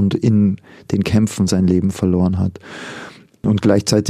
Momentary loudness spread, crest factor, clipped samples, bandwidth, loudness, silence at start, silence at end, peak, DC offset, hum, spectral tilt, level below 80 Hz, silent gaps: 16 LU; 16 dB; under 0.1%; 14.5 kHz; -17 LUFS; 0 s; 0 s; -2 dBFS; under 0.1%; none; -6.5 dB/octave; -44 dBFS; none